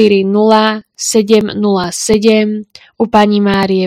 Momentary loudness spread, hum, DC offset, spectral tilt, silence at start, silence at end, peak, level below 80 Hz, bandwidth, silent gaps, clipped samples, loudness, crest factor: 7 LU; none; under 0.1%; -4.5 dB/octave; 0 s; 0 s; 0 dBFS; -44 dBFS; 15 kHz; none; 0.6%; -11 LUFS; 10 dB